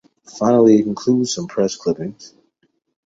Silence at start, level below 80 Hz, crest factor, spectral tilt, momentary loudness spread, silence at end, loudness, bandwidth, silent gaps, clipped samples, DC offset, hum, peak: 0.3 s; -58 dBFS; 18 dB; -6 dB/octave; 11 LU; 0.8 s; -17 LUFS; 8 kHz; none; under 0.1%; under 0.1%; none; 0 dBFS